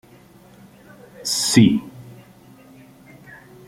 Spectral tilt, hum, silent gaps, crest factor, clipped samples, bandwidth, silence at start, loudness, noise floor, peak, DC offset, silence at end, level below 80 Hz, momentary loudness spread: -4 dB/octave; none; none; 22 dB; under 0.1%; 16.5 kHz; 1.2 s; -17 LUFS; -48 dBFS; -2 dBFS; under 0.1%; 1.55 s; -56 dBFS; 26 LU